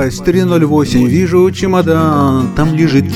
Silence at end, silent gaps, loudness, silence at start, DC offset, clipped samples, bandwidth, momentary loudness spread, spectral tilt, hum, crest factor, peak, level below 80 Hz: 0 s; none; -11 LUFS; 0 s; under 0.1%; under 0.1%; 15 kHz; 2 LU; -7 dB/octave; none; 10 dB; 0 dBFS; -32 dBFS